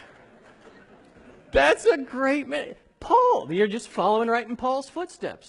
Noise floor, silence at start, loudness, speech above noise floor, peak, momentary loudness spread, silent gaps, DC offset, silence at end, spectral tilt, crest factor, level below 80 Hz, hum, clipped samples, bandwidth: -52 dBFS; 1.55 s; -23 LUFS; 29 dB; -6 dBFS; 13 LU; none; under 0.1%; 0.15 s; -4.5 dB/octave; 18 dB; -50 dBFS; none; under 0.1%; 11 kHz